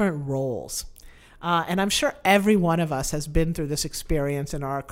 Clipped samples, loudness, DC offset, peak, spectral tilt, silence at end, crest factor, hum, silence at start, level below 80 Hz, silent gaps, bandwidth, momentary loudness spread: under 0.1%; -24 LUFS; under 0.1%; -4 dBFS; -4.5 dB/octave; 0 s; 20 dB; none; 0 s; -38 dBFS; none; 16 kHz; 10 LU